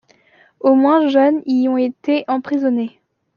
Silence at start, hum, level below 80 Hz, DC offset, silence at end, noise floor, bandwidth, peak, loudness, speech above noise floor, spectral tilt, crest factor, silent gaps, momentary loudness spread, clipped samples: 0.65 s; none; -70 dBFS; under 0.1%; 0.5 s; -53 dBFS; 6.4 kHz; -2 dBFS; -16 LUFS; 38 dB; -6.5 dB/octave; 14 dB; none; 7 LU; under 0.1%